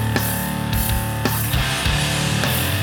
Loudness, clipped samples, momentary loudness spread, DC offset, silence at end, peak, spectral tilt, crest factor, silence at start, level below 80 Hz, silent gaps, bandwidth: -20 LUFS; under 0.1%; 3 LU; under 0.1%; 0 s; 0 dBFS; -4 dB/octave; 20 dB; 0 s; -30 dBFS; none; over 20 kHz